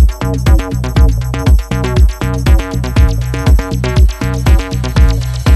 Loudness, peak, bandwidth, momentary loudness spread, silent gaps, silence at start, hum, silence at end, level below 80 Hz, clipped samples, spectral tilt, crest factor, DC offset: -13 LUFS; 0 dBFS; 13 kHz; 3 LU; none; 0 s; none; 0 s; -12 dBFS; under 0.1%; -6.5 dB/octave; 10 dB; under 0.1%